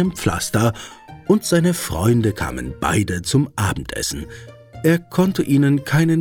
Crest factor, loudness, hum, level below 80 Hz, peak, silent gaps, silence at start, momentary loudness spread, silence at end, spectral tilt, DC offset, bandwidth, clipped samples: 16 dB; -19 LUFS; none; -40 dBFS; -2 dBFS; none; 0 s; 11 LU; 0 s; -5.5 dB/octave; under 0.1%; 18.5 kHz; under 0.1%